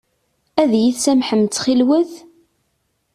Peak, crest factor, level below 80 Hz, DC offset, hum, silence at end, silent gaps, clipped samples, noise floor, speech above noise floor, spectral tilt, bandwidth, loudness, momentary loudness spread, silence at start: -2 dBFS; 16 dB; -60 dBFS; under 0.1%; none; 0.95 s; none; under 0.1%; -68 dBFS; 52 dB; -4.5 dB/octave; 14 kHz; -16 LUFS; 5 LU; 0.55 s